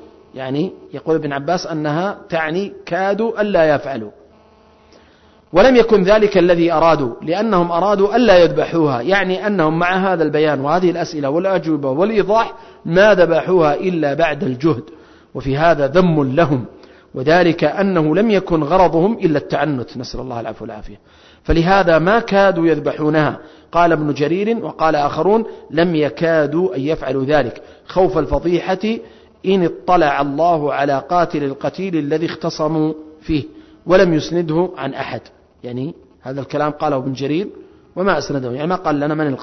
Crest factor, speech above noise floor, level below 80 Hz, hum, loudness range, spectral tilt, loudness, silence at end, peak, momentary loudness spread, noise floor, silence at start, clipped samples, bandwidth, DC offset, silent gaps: 14 dB; 34 dB; -38 dBFS; none; 5 LU; -7 dB/octave; -16 LUFS; 0 s; -2 dBFS; 13 LU; -49 dBFS; 0.35 s; under 0.1%; 6.4 kHz; under 0.1%; none